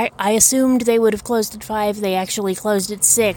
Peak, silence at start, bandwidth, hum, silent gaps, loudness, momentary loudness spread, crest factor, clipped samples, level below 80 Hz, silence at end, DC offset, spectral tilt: 0 dBFS; 0 s; 17.5 kHz; none; none; -17 LUFS; 9 LU; 16 dB; under 0.1%; -48 dBFS; 0 s; under 0.1%; -3 dB/octave